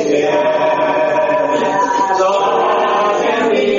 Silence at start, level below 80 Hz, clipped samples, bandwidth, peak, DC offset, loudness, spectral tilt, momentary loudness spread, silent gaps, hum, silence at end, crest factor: 0 s; -56 dBFS; under 0.1%; 7.6 kHz; -2 dBFS; under 0.1%; -14 LUFS; -2 dB/octave; 1 LU; none; none; 0 s; 12 dB